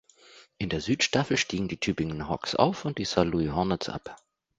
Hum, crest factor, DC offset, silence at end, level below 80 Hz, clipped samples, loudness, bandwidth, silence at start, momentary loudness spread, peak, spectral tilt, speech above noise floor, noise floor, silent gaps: none; 24 dB; under 0.1%; 0.45 s; -50 dBFS; under 0.1%; -28 LUFS; 9.6 kHz; 0.35 s; 9 LU; -6 dBFS; -4.5 dB/octave; 28 dB; -55 dBFS; none